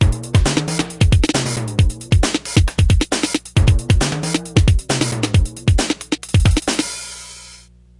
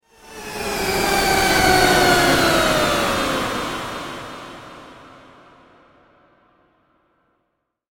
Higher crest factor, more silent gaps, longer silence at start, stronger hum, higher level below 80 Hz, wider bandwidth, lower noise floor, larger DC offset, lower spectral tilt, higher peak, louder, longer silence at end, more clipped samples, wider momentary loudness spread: about the same, 16 dB vs 20 dB; neither; second, 0 s vs 0.25 s; first, 60 Hz at -40 dBFS vs none; first, -22 dBFS vs -38 dBFS; second, 11.5 kHz vs 19 kHz; second, -44 dBFS vs -73 dBFS; neither; first, -5 dB/octave vs -3 dB/octave; about the same, -2 dBFS vs -2 dBFS; about the same, -17 LUFS vs -17 LUFS; second, 0.45 s vs 2.85 s; neither; second, 6 LU vs 21 LU